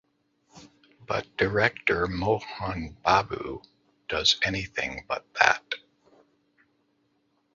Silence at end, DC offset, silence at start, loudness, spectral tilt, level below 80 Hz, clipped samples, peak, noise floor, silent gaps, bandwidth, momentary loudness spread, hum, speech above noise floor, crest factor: 1.75 s; under 0.1%; 0.55 s; -26 LUFS; -3.5 dB/octave; -50 dBFS; under 0.1%; -2 dBFS; -71 dBFS; none; 7.8 kHz; 13 LU; none; 44 dB; 26 dB